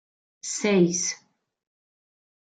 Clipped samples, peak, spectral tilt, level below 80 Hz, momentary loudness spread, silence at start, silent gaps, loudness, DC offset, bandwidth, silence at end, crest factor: under 0.1%; -8 dBFS; -4 dB/octave; -74 dBFS; 17 LU; 0.45 s; none; -24 LUFS; under 0.1%; 9.6 kHz; 1.3 s; 20 dB